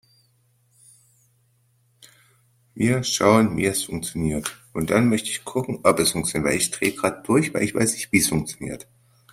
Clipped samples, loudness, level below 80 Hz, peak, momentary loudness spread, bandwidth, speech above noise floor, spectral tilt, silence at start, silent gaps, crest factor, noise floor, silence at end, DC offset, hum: under 0.1%; -22 LUFS; -50 dBFS; -2 dBFS; 11 LU; 16 kHz; 42 dB; -4 dB/octave; 2.75 s; none; 22 dB; -64 dBFS; 0.55 s; under 0.1%; none